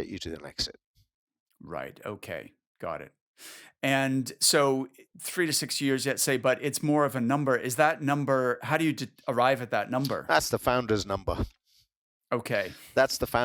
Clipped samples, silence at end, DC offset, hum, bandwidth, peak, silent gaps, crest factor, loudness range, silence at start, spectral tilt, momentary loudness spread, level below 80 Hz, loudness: under 0.1%; 0 s; under 0.1%; none; over 20 kHz; -6 dBFS; 0.86-0.94 s, 1.14-1.27 s, 1.40-1.46 s, 2.67-2.75 s, 3.21-3.34 s, 11.97-12.21 s; 22 dB; 9 LU; 0 s; -4 dB/octave; 14 LU; -52 dBFS; -27 LUFS